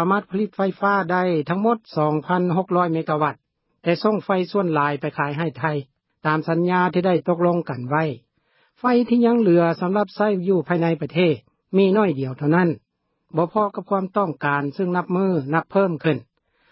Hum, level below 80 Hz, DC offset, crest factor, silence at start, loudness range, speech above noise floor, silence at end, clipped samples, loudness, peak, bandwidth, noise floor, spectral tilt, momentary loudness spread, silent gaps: none; -68 dBFS; under 0.1%; 16 dB; 0 s; 3 LU; 44 dB; 0.5 s; under 0.1%; -21 LUFS; -4 dBFS; 5.8 kHz; -64 dBFS; -12 dB/octave; 7 LU; none